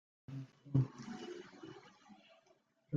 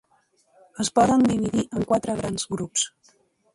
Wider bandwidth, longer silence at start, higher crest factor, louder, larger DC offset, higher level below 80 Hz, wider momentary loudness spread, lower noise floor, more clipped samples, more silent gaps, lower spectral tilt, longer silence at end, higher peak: second, 7.4 kHz vs 11.5 kHz; second, 0.3 s vs 0.75 s; first, 24 dB vs 18 dB; second, -42 LUFS vs -23 LUFS; neither; second, -76 dBFS vs -52 dBFS; first, 25 LU vs 10 LU; first, -73 dBFS vs -65 dBFS; neither; neither; first, -8 dB/octave vs -4.5 dB/octave; second, 0 s vs 0.65 s; second, -20 dBFS vs -6 dBFS